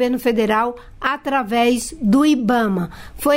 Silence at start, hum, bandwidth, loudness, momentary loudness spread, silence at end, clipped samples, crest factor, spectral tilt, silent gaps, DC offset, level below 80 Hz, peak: 0 s; none; 16.5 kHz; -18 LUFS; 9 LU; 0 s; under 0.1%; 12 dB; -5 dB/octave; none; under 0.1%; -44 dBFS; -6 dBFS